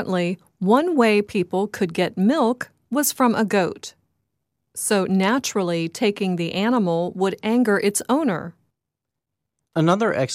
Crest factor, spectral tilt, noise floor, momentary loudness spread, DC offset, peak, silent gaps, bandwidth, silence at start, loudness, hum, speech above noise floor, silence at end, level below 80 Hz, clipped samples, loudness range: 16 dB; -5 dB/octave; -83 dBFS; 9 LU; under 0.1%; -4 dBFS; none; 15.5 kHz; 0 s; -21 LUFS; none; 63 dB; 0 s; -66 dBFS; under 0.1%; 2 LU